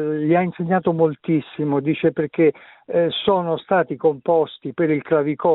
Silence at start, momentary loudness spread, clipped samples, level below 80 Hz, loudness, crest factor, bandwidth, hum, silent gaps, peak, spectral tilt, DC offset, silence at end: 0 s; 4 LU; under 0.1%; -60 dBFS; -20 LUFS; 16 dB; 4.1 kHz; none; none; -2 dBFS; -11.5 dB/octave; under 0.1%; 0 s